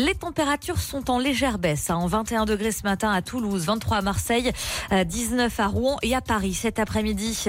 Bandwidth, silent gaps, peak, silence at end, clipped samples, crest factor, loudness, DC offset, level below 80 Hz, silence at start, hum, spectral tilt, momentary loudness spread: 16.5 kHz; none; -12 dBFS; 0 s; under 0.1%; 12 dB; -24 LUFS; under 0.1%; -38 dBFS; 0 s; none; -4 dB/octave; 3 LU